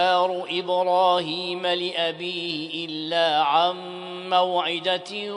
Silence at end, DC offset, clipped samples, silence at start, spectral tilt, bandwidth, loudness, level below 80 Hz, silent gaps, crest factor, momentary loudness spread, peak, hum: 0 s; under 0.1%; under 0.1%; 0 s; -4 dB/octave; 10.5 kHz; -23 LUFS; -78 dBFS; none; 16 dB; 9 LU; -8 dBFS; none